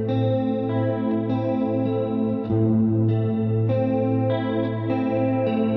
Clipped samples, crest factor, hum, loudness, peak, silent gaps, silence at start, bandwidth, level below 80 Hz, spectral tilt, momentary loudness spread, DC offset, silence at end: under 0.1%; 12 dB; none; -23 LUFS; -10 dBFS; none; 0 s; 4.2 kHz; -54 dBFS; -11.5 dB/octave; 3 LU; under 0.1%; 0 s